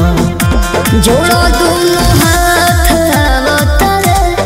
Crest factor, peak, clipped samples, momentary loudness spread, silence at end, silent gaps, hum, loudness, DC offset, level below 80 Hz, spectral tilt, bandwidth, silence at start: 8 dB; 0 dBFS; under 0.1%; 3 LU; 0 s; none; none; -9 LUFS; under 0.1%; -16 dBFS; -4.5 dB/octave; 16.5 kHz; 0 s